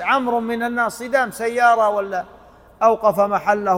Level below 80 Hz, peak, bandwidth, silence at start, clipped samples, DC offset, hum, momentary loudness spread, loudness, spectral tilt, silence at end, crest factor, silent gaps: -56 dBFS; -2 dBFS; 16.5 kHz; 0 s; under 0.1%; under 0.1%; none; 8 LU; -19 LUFS; -4.5 dB/octave; 0 s; 16 dB; none